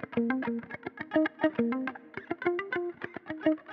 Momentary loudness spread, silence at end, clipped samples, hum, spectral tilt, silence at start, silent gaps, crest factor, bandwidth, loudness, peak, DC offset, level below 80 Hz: 11 LU; 0 s; under 0.1%; none; -8.5 dB/octave; 0 s; none; 18 dB; 5.4 kHz; -32 LUFS; -12 dBFS; under 0.1%; -72 dBFS